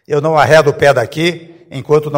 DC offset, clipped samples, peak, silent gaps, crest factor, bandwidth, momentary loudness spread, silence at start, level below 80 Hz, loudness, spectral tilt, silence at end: under 0.1%; 0.4%; 0 dBFS; none; 12 dB; 16.5 kHz; 20 LU; 0.1 s; -46 dBFS; -11 LUFS; -5.5 dB/octave; 0 s